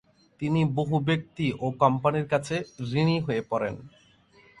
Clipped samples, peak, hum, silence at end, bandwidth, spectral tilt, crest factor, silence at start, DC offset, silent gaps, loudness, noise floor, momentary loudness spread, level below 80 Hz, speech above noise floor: under 0.1%; -6 dBFS; none; 0.7 s; 11 kHz; -7 dB/octave; 20 dB; 0.4 s; under 0.1%; none; -27 LUFS; -58 dBFS; 8 LU; -58 dBFS; 32 dB